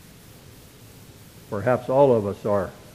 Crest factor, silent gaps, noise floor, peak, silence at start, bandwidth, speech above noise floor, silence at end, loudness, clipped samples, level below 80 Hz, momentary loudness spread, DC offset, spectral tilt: 20 dB; none; -47 dBFS; -4 dBFS; 1.5 s; 15.5 kHz; 26 dB; 0.2 s; -22 LUFS; under 0.1%; -56 dBFS; 9 LU; under 0.1%; -7.5 dB/octave